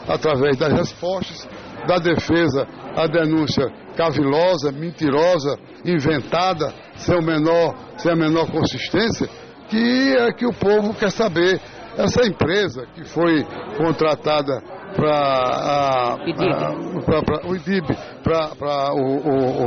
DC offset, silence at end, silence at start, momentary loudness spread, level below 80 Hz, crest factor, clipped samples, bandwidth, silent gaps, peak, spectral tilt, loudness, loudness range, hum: under 0.1%; 0 s; 0 s; 9 LU; -46 dBFS; 12 dB; under 0.1%; 6.6 kHz; none; -8 dBFS; -4.5 dB/octave; -20 LUFS; 2 LU; none